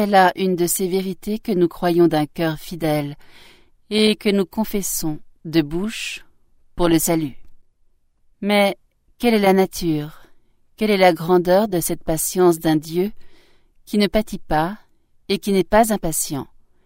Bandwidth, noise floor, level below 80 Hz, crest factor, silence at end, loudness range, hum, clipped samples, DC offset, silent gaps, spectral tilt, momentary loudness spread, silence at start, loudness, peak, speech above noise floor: 16.5 kHz; -58 dBFS; -42 dBFS; 18 dB; 0.4 s; 4 LU; none; under 0.1%; under 0.1%; none; -4.5 dB/octave; 11 LU; 0 s; -19 LUFS; 0 dBFS; 40 dB